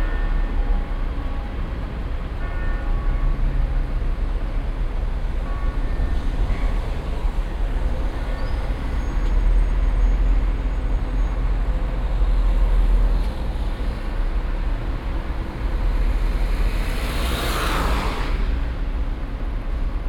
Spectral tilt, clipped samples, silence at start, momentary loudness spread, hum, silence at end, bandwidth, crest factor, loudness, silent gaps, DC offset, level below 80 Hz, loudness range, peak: -6 dB/octave; under 0.1%; 0 s; 6 LU; none; 0 s; 13 kHz; 12 dB; -26 LUFS; none; under 0.1%; -20 dBFS; 3 LU; -8 dBFS